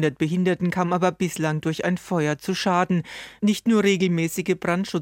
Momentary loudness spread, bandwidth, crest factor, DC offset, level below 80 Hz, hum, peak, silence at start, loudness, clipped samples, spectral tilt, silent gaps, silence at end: 5 LU; 16.5 kHz; 14 dB; under 0.1%; -60 dBFS; none; -8 dBFS; 0 s; -23 LUFS; under 0.1%; -6 dB/octave; none; 0 s